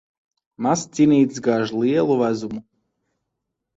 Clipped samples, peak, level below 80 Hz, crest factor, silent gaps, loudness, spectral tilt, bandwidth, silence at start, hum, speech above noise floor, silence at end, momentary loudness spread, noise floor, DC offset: under 0.1%; -6 dBFS; -62 dBFS; 16 dB; none; -20 LUFS; -6 dB/octave; 8 kHz; 0.6 s; none; 61 dB; 1.15 s; 11 LU; -80 dBFS; under 0.1%